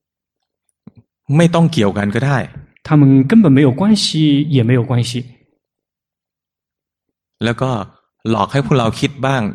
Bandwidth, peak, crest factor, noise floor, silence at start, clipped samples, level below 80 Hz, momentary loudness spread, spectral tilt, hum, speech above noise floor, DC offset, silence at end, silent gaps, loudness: 11.5 kHz; 0 dBFS; 16 dB; -86 dBFS; 1.3 s; under 0.1%; -48 dBFS; 12 LU; -6.5 dB/octave; none; 73 dB; under 0.1%; 0 s; none; -14 LUFS